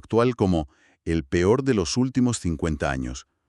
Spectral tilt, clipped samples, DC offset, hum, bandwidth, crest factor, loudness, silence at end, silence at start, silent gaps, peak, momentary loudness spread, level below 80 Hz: -6 dB/octave; under 0.1%; under 0.1%; none; 11.5 kHz; 18 dB; -24 LUFS; 0.3 s; 0.1 s; none; -6 dBFS; 10 LU; -40 dBFS